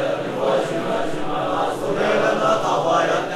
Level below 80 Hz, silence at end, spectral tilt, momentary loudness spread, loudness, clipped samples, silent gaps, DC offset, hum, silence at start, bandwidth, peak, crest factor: -46 dBFS; 0 s; -5 dB/octave; 5 LU; -20 LUFS; under 0.1%; none; under 0.1%; none; 0 s; 15 kHz; -6 dBFS; 14 dB